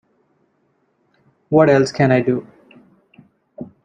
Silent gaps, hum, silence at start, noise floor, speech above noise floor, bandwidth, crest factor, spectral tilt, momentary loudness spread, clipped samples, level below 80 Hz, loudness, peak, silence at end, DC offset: none; none; 1.5 s; -64 dBFS; 50 dB; 10 kHz; 18 dB; -7 dB/octave; 20 LU; under 0.1%; -58 dBFS; -16 LUFS; -2 dBFS; 0.2 s; under 0.1%